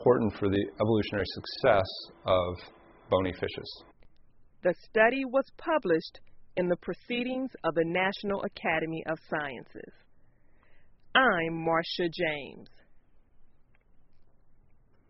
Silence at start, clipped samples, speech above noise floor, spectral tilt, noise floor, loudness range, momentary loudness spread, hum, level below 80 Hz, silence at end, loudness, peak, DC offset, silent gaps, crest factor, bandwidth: 0 s; under 0.1%; 30 dB; -3.5 dB/octave; -59 dBFS; 4 LU; 13 LU; none; -58 dBFS; 0.85 s; -29 LUFS; -8 dBFS; under 0.1%; none; 22 dB; 5.8 kHz